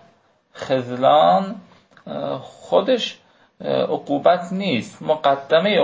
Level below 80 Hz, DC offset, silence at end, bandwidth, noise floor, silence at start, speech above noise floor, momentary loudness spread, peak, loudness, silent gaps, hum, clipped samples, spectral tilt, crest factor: -66 dBFS; under 0.1%; 0 s; 8 kHz; -57 dBFS; 0.55 s; 38 dB; 16 LU; -2 dBFS; -20 LUFS; none; none; under 0.1%; -6 dB/octave; 18 dB